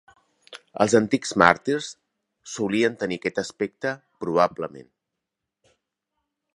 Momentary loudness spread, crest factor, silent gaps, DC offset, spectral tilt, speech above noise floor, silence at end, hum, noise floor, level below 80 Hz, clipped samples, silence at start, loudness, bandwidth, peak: 19 LU; 26 dB; none; under 0.1%; -4.5 dB/octave; 61 dB; 1.7 s; none; -84 dBFS; -60 dBFS; under 0.1%; 0.5 s; -23 LUFS; 11.5 kHz; 0 dBFS